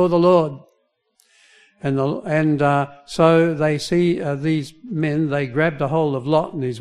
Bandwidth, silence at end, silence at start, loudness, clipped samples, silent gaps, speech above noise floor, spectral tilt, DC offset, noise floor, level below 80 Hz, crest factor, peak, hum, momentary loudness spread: 12 kHz; 0 s; 0 s; -19 LUFS; under 0.1%; none; 48 dB; -7 dB/octave; under 0.1%; -66 dBFS; -54 dBFS; 18 dB; -2 dBFS; none; 10 LU